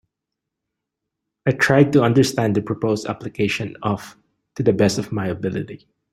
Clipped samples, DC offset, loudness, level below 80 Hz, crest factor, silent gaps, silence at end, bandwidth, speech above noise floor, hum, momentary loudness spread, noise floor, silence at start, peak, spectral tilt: under 0.1%; under 0.1%; -20 LUFS; -54 dBFS; 20 dB; none; 0.35 s; 15.5 kHz; 63 dB; none; 13 LU; -82 dBFS; 1.45 s; -2 dBFS; -6 dB/octave